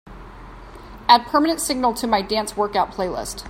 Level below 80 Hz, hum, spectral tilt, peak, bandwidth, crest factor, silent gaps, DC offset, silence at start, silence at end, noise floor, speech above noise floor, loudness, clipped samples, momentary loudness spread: -44 dBFS; none; -3 dB/octave; 0 dBFS; 16.5 kHz; 20 dB; none; under 0.1%; 0.05 s; 0 s; -39 dBFS; 19 dB; -20 LUFS; under 0.1%; 11 LU